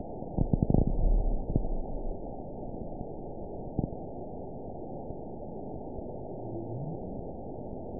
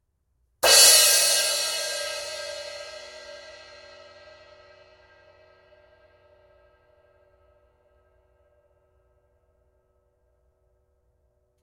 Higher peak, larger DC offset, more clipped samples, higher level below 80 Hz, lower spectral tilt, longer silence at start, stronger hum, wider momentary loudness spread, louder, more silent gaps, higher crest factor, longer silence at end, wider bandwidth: second, -10 dBFS vs -2 dBFS; first, 0.5% vs under 0.1%; neither; first, -36 dBFS vs -64 dBFS; first, -17 dB/octave vs 2.5 dB/octave; second, 0 s vs 0.65 s; neither; second, 12 LU vs 29 LU; second, -36 LUFS vs -17 LUFS; neither; about the same, 24 dB vs 26 dB; second, 0 s vs 8.1 s; second, 1 kHz vs 17 kHz